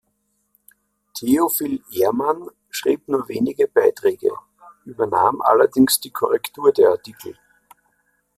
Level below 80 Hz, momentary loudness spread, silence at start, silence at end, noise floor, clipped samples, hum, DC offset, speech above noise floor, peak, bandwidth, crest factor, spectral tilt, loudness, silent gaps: -62 dBFS; 15 LU; 1.15 s; 1.05 s; -69 dBFS; under 0.1%; none; under 0.1%; 51 dB; -2 dBFS; 16 kHz; 18 dB; -4 dB/octave; -19 LUFS; none